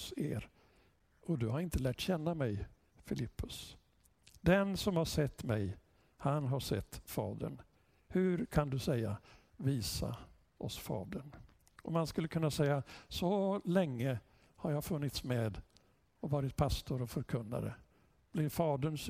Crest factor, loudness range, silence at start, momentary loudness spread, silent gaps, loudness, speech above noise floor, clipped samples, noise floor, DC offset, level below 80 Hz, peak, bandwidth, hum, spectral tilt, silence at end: 22 dB; 3 LU; 0 s; 12 LU; none; -37 LUFS; 34 dB; under 0.1%; -70 dBFS; under 0.1%; -54 dBFS; -16 dBFS; 16 kHz; none; -6 dB/octave; 0 s